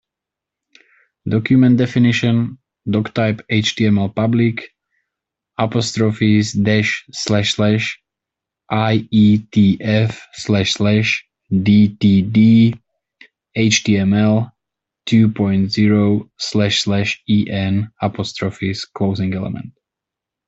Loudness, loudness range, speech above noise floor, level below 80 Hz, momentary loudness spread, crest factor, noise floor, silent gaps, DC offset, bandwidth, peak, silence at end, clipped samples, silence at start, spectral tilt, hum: -16 LUFS; 4 LU; 69 dB; -52 dBFS; 10 LU; 16 dB; -84 dBFS; none; under 0.1%; 8 kHz; -2 dBFS; 0.75 s; under 0.1%; 1.25 s; -6 dB/octave; none